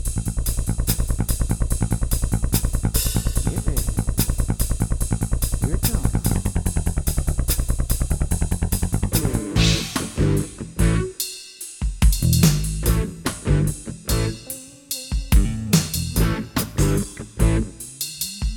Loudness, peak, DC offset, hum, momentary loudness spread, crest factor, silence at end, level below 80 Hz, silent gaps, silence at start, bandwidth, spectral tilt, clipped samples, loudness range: -23 LUFS; -4 dBFS; under 0.1%; none; 7 LU; 18 dB; 0 s; -24 dBFS; none; 0 s; over 20 kHz; -5 dB/octave; under 0.1%; 2 LU